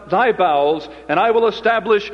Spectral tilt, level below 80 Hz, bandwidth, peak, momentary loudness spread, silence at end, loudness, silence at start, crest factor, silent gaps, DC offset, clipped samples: -6 dB/octave; -52 dBFS; 6.6 kHz; -2 dBFS; 5 LU; 0 s; -17 LUFS; 0 s; 14 dB; none; under 0.1%; under 0.1%